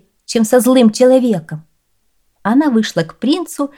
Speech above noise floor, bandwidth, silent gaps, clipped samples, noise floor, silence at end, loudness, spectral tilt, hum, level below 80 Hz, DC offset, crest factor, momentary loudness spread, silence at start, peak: 52 dB; 18 kHz; none; under 0.1%; -64 dBFS; 0.1 s; -13 LUFS; -5 dB/octave; none; -62 dBFS; 0.1%; 14 dB; 12 LU; 0.3 s; 0 dBFS